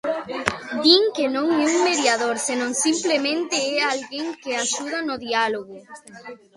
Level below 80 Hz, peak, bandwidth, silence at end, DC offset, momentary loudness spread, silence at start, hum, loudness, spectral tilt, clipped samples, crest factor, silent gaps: -60 dBFS; 0 dBFS; 11.5 kHz; 0.2 s; under 0.1%; 14 LU; 0.05 s; none; -21 LUFS; -1.5 dB/octave; under 0.1%; 22 dB; none